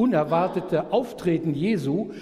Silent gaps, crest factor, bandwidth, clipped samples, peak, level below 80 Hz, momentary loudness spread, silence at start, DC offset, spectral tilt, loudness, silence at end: none; 14 dB; 14.5 kHz; under 0.1%; -8 dBFS; -56 dBFS; 4 LU; 0 s; under 0.1%; -8 dB/octave; -24 LUFS; 0 s